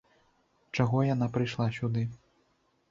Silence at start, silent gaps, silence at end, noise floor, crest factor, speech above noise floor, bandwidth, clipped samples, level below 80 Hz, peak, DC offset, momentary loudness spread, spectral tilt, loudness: 0.75 s; none; 0.75 s; -71 dBFS; 18 dB; 43 dB; 7.4 kHz; under 0.1%; -62 dBFS; -12 dBFS; under 0.1%; 8 LU; -7.5 dB/octave; -30 LUFS